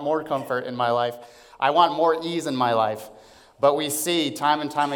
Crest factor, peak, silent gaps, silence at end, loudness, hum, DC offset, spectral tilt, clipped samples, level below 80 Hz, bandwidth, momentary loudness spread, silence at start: 20 dB; -4 dBFS; none; 0 s; -23 LUFS; none; under 0.1%; -3.5 dB/octave; under 0.1%; -68 dBFS; 18 kHz; 8 LU; 0 s